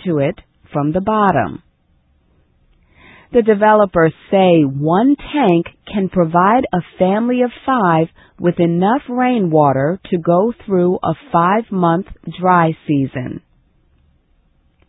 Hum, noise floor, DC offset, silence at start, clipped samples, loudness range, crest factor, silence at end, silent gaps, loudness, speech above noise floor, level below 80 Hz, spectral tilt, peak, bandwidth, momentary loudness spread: none; -57 dBFS; under 0.1%; 0.05 s; under 0.1%; 4 LU; 16 dB; 1.5 s; none; -15 LUFS; 43 dB; -48 dBFS; -11.5 dB/octave; 0 dBFS; 4 kHz; 9 LU